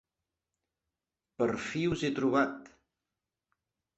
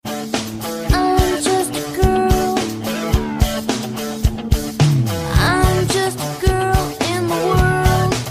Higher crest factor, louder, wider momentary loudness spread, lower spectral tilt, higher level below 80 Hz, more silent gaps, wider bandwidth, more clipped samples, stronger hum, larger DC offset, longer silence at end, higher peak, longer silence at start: first, 22 dB vs 16 dB; second, -31 LUFS vs -18 LUFS; second, 5 LU vs 8 LU; about the same, -6 dB/octave vs -5 dB/octave; second, -64 dBFS vs -24 dBFS; neither; second, 8.4 kHz vs 15.5 kHz; neither; neither; neither; first, 1.3 s vs 0 s; second, -14 dBFS vs -2 dBFS; first, 1.4 s vs 0.05 s